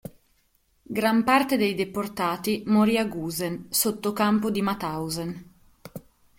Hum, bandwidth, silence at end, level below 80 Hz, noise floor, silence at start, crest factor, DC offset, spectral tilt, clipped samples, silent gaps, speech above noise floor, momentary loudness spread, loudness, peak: none; 16.5 kHz; 0.4 s; -58 dBFS; -67 dBFS; 0.05 s; 20 dB; under 0.1%; -4.5 dB/octave; under 0.1%; none; 42 dB; 20 LU; -25 LUFS; -6 dBFS